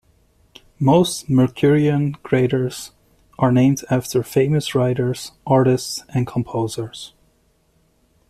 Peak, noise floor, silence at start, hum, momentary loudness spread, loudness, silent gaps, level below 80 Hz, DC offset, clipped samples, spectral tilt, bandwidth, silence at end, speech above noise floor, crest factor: -4 dBFS; -61 dBFS; 0.8 s; none; 12 LU; -19 LUFS; none; -52 dBFS; under 0.1%; under 0.1%; -6.5 dB/octave; 14 kHz; 1.2 s; 43 dB; 16 dB